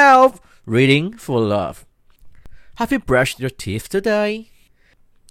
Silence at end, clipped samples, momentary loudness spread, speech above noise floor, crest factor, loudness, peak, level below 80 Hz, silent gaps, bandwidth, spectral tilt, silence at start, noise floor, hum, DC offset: 0.85 s; under 0.1%; 13 LU; 35 dB; 18 dB; -18 LUFS; 0 dBFS; -44 dBFS; none; 16 kHz; -5.5 dB/octave; 0 s; -54 dBFS; none; under 0.1%